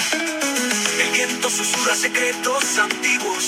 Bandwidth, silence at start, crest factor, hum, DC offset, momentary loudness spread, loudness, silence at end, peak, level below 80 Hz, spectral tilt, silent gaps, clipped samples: 16.5 kHz; 0 s; 16 dB; none; under 0.1%; 3 LU; -18 LUFS; 0 s; -4 dBFS; -70 dBFS; -0.5 dB/octave; none; under 0.1%